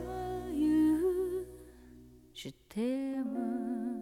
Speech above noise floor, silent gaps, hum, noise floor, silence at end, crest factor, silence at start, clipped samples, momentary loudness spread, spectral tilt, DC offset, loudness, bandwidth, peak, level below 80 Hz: 20 dB; none; none; -56 dBFS; 0 s; 12 dB; 0 s; under 0.1%; 19 LU; -6.5 dB/octave; under 0.1%; -33 LUFS; 15.5 kHz; -22 dBFS; -56 dBFS